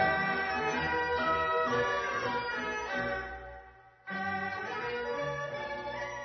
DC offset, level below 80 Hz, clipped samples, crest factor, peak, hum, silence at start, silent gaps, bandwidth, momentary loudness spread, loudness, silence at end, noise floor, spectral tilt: under 0.1%; -56 dBFS; under 0.1%; 18 dB; -16 dBFS; none; 0 s; none; 6.2 kHz; 10 LU; -32 LUFS; 0 s; -54 dBFS; -2 dB/octave